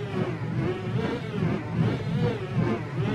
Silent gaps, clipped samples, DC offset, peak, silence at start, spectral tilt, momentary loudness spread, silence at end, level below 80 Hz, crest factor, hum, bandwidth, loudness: none; under 0.1%; under 0.1%; -12 dBFS; 0 s; -8 dB/octave; 3 LU; 0 s; -50 dBFS; 14 dB; none; 9.8 kHz; -28 LUFS